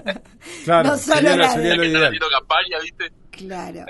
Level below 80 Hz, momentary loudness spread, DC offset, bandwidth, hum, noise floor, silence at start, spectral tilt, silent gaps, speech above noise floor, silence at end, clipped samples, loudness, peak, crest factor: -48 dBFS; 17 LU; under 0.1%; 12 kHz; none; -38 dBFS; 0.05 s; -3.5 dB/octave; none; 20 dB; 0 s; under 0.1%; -16 LUFS; -2 dBFS; 18 dB